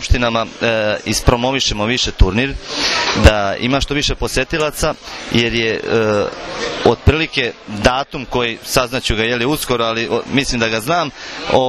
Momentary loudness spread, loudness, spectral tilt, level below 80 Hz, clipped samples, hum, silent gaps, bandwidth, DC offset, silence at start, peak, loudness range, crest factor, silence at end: 6 LU; -16 LUFS; -4 dB/octave; -24 dBFS; 0.2%; none; none; 14 kHz; under 0.1%; 0 s; 0 dBFS; 2 LU; 16 dB; 0 s